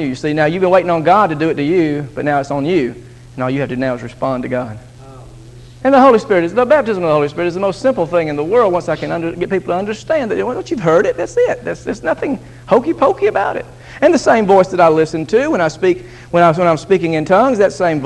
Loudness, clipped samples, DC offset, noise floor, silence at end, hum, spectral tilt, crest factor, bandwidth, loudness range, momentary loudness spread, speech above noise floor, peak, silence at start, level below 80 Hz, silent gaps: -14 LUFS; under 0.1%; under 0.1%; -36 dBFS; 0 s; none; -6.5 dB/octave; 14 dB; 11.5 kHz; 5 LU; 9 LU; 22 dB; 0 dBFS; 0 s; -44 dBFS; none